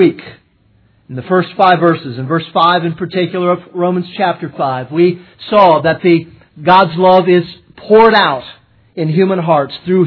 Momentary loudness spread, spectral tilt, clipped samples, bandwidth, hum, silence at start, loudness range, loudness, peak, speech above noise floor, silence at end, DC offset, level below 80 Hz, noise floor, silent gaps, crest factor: 11 LU; -9 dB/octave; 0.3%; 5.4 kHz; none; 0 s; 4 LU; -12 LUFS; 0 dBFS; 41 dB; 0 s; under 0.1%; -54 dBFS; -52 dBFS; none; 12 dB